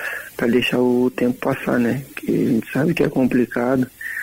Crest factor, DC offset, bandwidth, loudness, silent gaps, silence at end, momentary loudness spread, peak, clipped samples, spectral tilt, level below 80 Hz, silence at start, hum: 14 dB; under 0.1%; 16 kHz; -20 LUFS; none; 0 s; 6 LU; -6 dBFS; under 0.1%; -6.5 dB/octave; -52 dBFS; 0 s; none